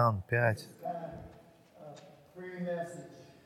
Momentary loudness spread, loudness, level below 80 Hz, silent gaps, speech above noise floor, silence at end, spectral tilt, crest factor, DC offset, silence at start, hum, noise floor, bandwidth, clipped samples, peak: 24 LU; -35 LUFS; -66 dBFS; none; 26 dB; 0.15 s; -7 dB/octave; 22 dB; under 0.1%; 0 s; none; -58 dBFS; 14.5 kHz; under 0.1%; -14 dBFS